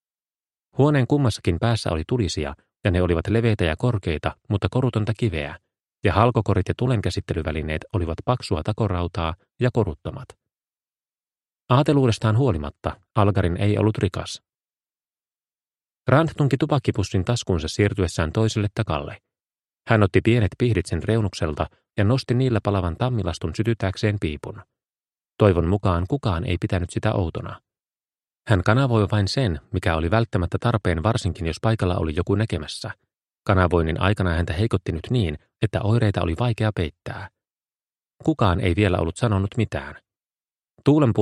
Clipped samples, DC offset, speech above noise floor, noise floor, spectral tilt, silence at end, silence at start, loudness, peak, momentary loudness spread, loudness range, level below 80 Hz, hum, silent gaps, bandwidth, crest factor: under 0.1%; under 0.1%; over 69 dB; under -90 dBFS; -7 dB/octave; 0 s; 0.75 s; -23 LUFS; 0 dBFS; 10 LU; 3 LU; -40 dBFS; none; 40.71-40.75 s; 11.5 kHz; 22 dB